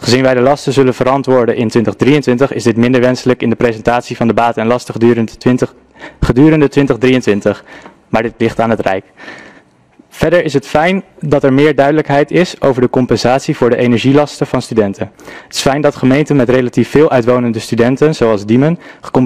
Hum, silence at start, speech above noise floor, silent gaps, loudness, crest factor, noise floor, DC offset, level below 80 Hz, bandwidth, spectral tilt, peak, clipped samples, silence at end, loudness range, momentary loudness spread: none; 0 s; 35 dB; none; -12 LUFS; 12 dB; -46 dBFS; 0.5%; -36 dBFS; 14.5 kHz; -6.5 dB/octave; 0 dBFS; under 0.1%; 0 s; 4 LU; 7 LU